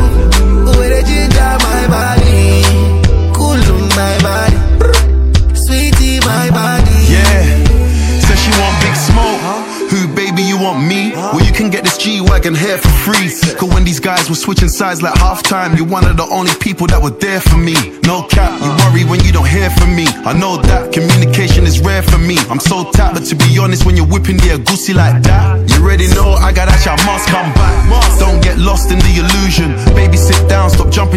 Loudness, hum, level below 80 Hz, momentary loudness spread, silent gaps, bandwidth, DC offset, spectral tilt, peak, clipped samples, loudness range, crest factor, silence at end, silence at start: -10 LUFS; none; -12 dBFS; 4 LU; none; 16.5 kHz; under 0.1%; -5 dB/octave; 0 dBFS; under 0.1%; 2 LU; 8 dB; 0 s; 0 s